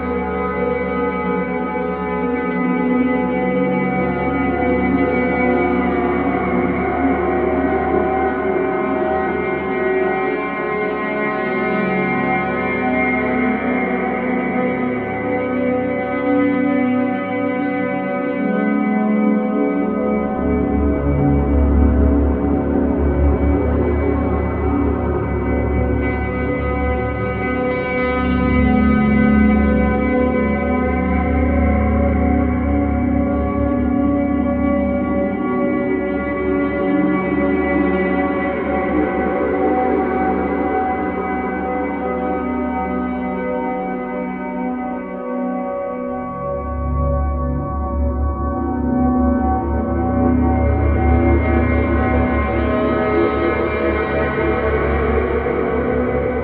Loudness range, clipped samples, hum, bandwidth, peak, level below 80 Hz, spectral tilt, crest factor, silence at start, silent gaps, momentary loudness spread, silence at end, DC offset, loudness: 4 LU; under 0.1%; none; 4.3 kHz; -2 dBFS; -26 dBFS; -11.5 dB/octave; 16 dB; 0 s; none; 5 LU; 0 s; 0.1%; -18 LUFS